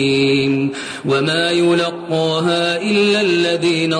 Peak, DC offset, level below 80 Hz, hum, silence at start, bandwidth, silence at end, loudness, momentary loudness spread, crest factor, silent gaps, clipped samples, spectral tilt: -6 dBFS; under 0.1%; -56 dBFS; none; 0 s; 10.5 kHz; 0 s; -16 LUFS; 5 LU; 10 dB; none; under 0.1%; -5 dB/octave